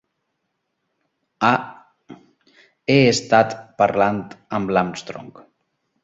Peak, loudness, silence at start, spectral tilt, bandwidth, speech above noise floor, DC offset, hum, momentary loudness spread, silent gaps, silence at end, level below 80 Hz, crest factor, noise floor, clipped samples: -2 dBFS; -19 LUFS; 1.4 s; -5 dB/octave; 8 kHz; 56 dB; under 0.1%; none; 17 LU; none; 0.75 s; -56 dBFS; 20 dB; -75 dBFS; under 0.1%